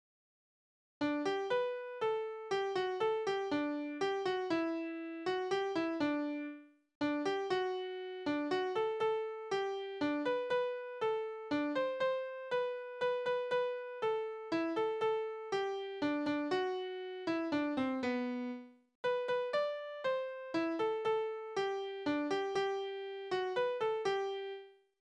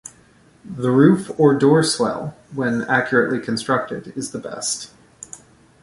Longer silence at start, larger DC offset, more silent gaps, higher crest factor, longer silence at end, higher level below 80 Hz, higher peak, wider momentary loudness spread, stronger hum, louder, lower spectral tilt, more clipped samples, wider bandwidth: first, 1 s vs 0.65 s; neither; first, 6.95-7.01 s, 18.95-19.04 s vs none; about the same, 14 dB vs 18 dB; second, 0.3 s vs 0.45 s; second, -78 dBFS vs -58 dBFS; second, -22 dBFS vs -2 dBFS; second, 5 LU vs 23 LU; neither; second, -37 LUFS vs -19 LUFS; about the same, -5 dB/octave vs -5 dB/octave; neither; second, 9.8 kHz vs 11.5 kHz